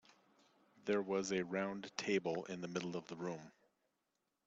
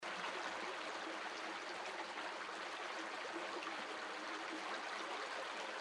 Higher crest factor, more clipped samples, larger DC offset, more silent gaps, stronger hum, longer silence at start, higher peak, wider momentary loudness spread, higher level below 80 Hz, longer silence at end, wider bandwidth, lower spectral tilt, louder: first, 22 dB vs 16 dB; neither; neither; neither; neither; first, 0.85 s vs 0 s; first, -20 dBFS vs -30 dBFS; first, 8 LU vs 2 LU; first, -82 dBFS vs -88 dBFS; first, 0.95 s vs 0 s; second, 8.2 kHz vs 12.5 kHz; first, -4.5 dB/octave vs -1.5 dB/octave; first, -41 LUFS vs -45 LUFS